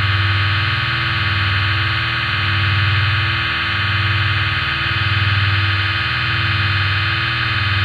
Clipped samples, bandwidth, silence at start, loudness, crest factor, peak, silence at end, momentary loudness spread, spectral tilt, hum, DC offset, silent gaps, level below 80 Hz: under 0.1%; 6.4 kHz; 0 s; -16 LUFS; 12 dB; -4 dBFS; 0 s; 2 LU; -5.5 dB/octave; none; under 0.1%; none; -34 dBFS